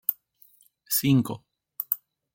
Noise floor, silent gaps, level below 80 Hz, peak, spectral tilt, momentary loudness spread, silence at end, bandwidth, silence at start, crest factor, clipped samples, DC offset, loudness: -60 dBFS; none; -64 dBFS; -2 dBFS; -5 dB/octave; 21 LU; 0.4 s; 17 kHz; 0.1 s; 26 dB; under 0.1%; under 0.1%; -26 LUFS